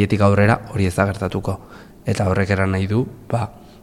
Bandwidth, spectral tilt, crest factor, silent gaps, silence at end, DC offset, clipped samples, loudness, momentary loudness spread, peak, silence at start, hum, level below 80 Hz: 13 kHz; -7 dB/octave; 18 dB; none; 0.25 s; under 0.1%; under 0.1%; -20 LUFS; 12 LU; -2 dBFS; 0 s; none; -42 dBFS